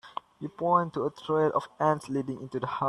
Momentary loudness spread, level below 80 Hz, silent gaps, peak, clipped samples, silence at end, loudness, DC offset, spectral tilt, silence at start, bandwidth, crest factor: 12 LU; -68 dBFS; none; -10 dBFS; under 0.1%; 0 s; -29 LUFS; under 0.1%; -7 dB/octave; 0.05 s; 11.5 kHz; 18 dB